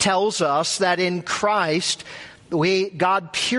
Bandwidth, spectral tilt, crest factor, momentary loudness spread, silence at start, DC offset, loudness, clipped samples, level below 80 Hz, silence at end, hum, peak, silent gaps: 11.5 kHz; -3.5 dB/octave; 16 dB; 8 LU; 0 s; under 0.1%; -21 LUFS; under 0.1%; -62 dBFS; 0 s; none; -6 dBFS; none